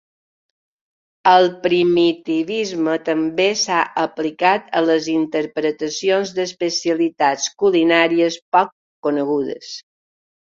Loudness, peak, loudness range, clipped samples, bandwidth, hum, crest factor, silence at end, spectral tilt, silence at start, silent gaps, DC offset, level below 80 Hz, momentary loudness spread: -18 LUFS; -2 dBFS; 2 LU; under 0.1%; 7.6 kHz; none; 18 dB; 0.75 s; -3.5 dB/octave; 1.25 s; 8.42-8.52 s, 8.72-9.02 s; under 0.1%; -64 dBFS; 8 LU